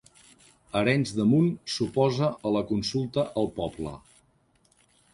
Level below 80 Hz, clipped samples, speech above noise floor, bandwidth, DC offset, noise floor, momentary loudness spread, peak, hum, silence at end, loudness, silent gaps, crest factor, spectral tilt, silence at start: -56 dBFS; under 0.1%; 40 dB; 11.5 kHz; under 0.1%; -66 dBFS; 10 LU; -8 dBFS; none; 1.15 s; -27 LUFS; none; 20 dB; -6.5 dB/octave; 0.75 s